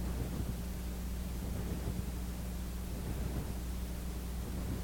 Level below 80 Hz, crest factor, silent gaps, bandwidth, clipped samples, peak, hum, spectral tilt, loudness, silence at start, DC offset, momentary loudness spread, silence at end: -40 dBFS; 12 dB; none; 17.5 kHz; under 0.1%; -26 dBFS; none; -6 dB/octave; -41 LUFS; 0 s; under 0.1%; 3 LU; 0 s